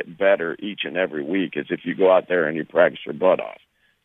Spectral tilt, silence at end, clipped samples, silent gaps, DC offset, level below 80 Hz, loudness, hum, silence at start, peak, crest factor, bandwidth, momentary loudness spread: -8 dB/octave; 0.5 s; under 0.1%; none; under 0.1%; -68 dBFS; -21 LUFS; none; 0 s; -2 dBFS; 18 dB; 3.9 kHz; 10 LU